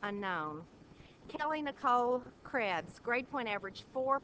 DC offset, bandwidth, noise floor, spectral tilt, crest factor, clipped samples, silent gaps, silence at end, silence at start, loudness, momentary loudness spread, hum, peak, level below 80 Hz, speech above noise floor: under 0.1%; 8 kHz; -57 dBFS; -5.5 dB/octave; 18 dB; under 0.1%; none; 0.05 s; 0 s; -36 LUFS; 11 LU; none; -18 dBFS; -68 dBFS; 21 dB